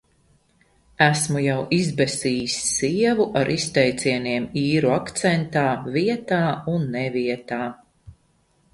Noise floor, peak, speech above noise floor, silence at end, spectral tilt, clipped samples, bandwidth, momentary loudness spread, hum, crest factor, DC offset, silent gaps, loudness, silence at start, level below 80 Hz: -63 dBFS; 0 dBFS; 42 dB; 0.6 s; -4.5 dB/octave; under 0.1%; 11.5 kHz; 5 LU; none; 22 dB; under 0.1%; none; -22 LUFS; 1 s; -54 dBFS